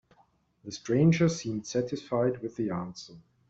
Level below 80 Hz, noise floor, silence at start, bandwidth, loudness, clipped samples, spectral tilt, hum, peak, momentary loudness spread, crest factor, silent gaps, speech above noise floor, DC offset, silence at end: -60 dBFS; -66 dBFS; 0.65 s; 7.8 kHz; -29 LUFS; under 0.1%; -6.5 dB/octave; none; -12 dBFS; 20 LU; 18 dB; none; 38 dB; under 0.1%; 0.3 s